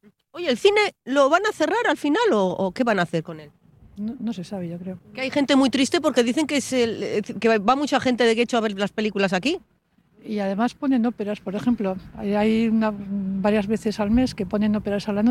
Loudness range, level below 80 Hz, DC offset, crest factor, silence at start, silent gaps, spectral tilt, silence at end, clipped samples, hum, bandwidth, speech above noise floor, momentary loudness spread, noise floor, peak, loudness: 4 LU; -50 dBFS; under 0.1%; 16 dB; 0.35 s; none; -5 dB/octave; 0 s; under 0.1%; none; 13 kHz; 38 dB; 11 LU; -60 dBFS; -6 dBFS; -22 LUFS